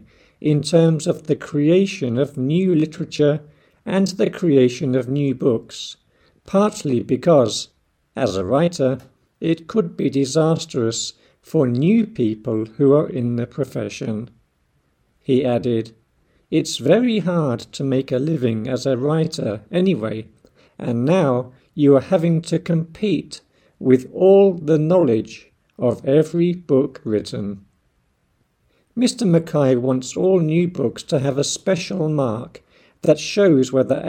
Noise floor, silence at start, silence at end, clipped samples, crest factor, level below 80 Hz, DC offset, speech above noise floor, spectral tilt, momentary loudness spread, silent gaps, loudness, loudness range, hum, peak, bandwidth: -65 dBFS; 0.4 s; 0 s; under 0.1%; 18 dB; -58 dBFS; under 0.1%; 47 dB; -6.5 dB/octave; 11 LU; none; -19 LUFS; 4 LU; none; -2 dBFS; 13.5 kHz